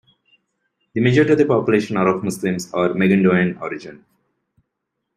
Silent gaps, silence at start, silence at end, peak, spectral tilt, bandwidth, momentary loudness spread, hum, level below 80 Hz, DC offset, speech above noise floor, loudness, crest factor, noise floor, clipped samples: none; 0.95 s; 1.2 s; -2 dBFS; -7 dB/octave; 13.5 kHz; 14 LU; none; -58 dBFS; under 0.1%; 60 dB; -18 LUFS; 18 dB; -77 dBFS; under 0.1%